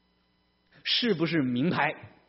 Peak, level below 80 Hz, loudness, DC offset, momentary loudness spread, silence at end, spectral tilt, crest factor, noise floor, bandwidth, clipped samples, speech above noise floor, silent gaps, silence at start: -10 dBFS; -68 dBFS; -27 LUFS; under 0.1%; 4 LU; 0.2 s; -3 dB/octave; 20 dB; -70 dBFS; 6 kHz; under 0.1%; 42 dB; none; 0.85 s